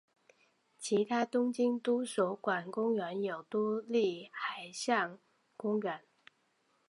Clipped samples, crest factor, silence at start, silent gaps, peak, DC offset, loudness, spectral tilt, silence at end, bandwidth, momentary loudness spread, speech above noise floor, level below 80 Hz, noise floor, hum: under 0.1%; 20 dB; 0.8 s; none; -16 dBFS; under 0.1%; -34 LUFS; -4.5 dB/octave; 0.9 s; 11.5 kHz; 8 LU; 42 dB; under -90 dBFS; -75 dBFS; none